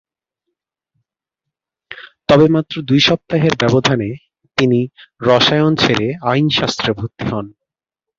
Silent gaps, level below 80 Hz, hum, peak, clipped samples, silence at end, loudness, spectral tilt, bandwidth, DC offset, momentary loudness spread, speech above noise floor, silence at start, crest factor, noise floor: none; -48 dBFS; none; 0 dBFS; under 0.1%; 0.7 s; -15 LUFS; -5.5 dB/octave; 7.6 kHz; under 0.1%; 14 LU; 70 dB; 1.9 s; 16 dB; -85 dBFS